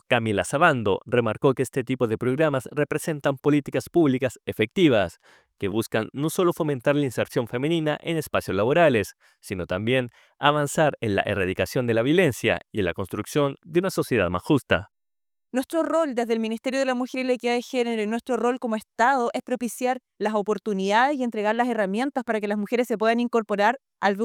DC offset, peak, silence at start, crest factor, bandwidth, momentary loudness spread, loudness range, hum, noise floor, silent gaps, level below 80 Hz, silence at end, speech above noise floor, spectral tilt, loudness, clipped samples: under 0.1%; -4 dBFS; 0.1 s; 20 dB; 18.5 kHz; 7 LU; 2 LU; none; under -90 dBFS; none; -58 dBFS; 0 s; over 66 dB; -5.5 dB/octave; -24 LUFS; under 0.1%